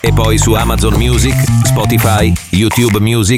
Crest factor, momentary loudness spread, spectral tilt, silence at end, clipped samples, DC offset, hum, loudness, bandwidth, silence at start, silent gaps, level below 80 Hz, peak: 10 dB; 2 LU; -5 dB/octave; 0 s; under 0.1%; under 0.1%; none; -11 LUFS; 16.5 kHz; 0.05 s; none; -20 dBFS; 0 dBFS